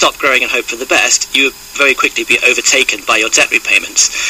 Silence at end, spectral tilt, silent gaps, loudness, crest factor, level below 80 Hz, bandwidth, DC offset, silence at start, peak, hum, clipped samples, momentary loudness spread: 0 s; 0.5 dB/octave; none; -10 LUFS; 12 dB; -46 dBFS; 15.5 kHz; under 0.1%; 0 s; 0 dBFS; none; under 0.1%; 4 LU